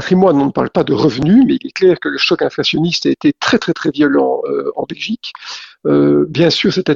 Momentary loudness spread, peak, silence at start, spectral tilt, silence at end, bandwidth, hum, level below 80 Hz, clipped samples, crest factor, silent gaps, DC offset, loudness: 11 LU; 0 dBFS; 0 s; -6 dB/octave; 0 s; 7.6 kHz; none; -48 dBFS; under 0.1%; 14 dB; none; under 0.1%; -14 LUFS